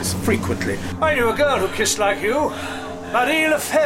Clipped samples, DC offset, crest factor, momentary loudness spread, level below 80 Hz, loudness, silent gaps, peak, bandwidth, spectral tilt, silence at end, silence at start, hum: under 0.1%; under 0.1%; 14 dB; 7 LU; -42 dBFS; -20 LUFS; none; -4 dBFS; 16.5 kHz; -3.5 dB/octave; 0 s; 0 s; none